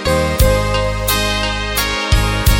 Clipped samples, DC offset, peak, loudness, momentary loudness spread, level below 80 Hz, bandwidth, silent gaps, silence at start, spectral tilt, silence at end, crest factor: under 0.1%; under 0.1%; 0 dBFS; -15 LUFS; 3 LU; -20 dBFS; 17 kHz; none; 0 s; -4 dB/octave; 0 s; 14 dB